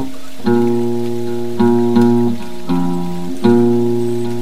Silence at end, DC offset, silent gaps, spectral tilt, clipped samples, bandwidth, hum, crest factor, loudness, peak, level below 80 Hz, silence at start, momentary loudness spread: 0 s; 10%; none; -7.5 dB/octave; under 0.1%; 15 kHz; none; 14 dB; -16 LUFS; 0 dBFS; -50 dBFS; 0 s; 10 LU